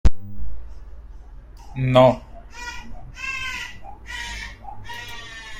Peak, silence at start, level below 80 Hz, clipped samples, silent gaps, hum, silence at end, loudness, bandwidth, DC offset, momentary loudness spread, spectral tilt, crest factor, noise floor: -2 dBFS; 0.05 s; -32 dBFS; under 0.1%; none; none; 0 s; -23 LUFS; 16.5 kHz; under 0.1%; 27 LU; -6 dB/octave; 20 dB; -40 dBFS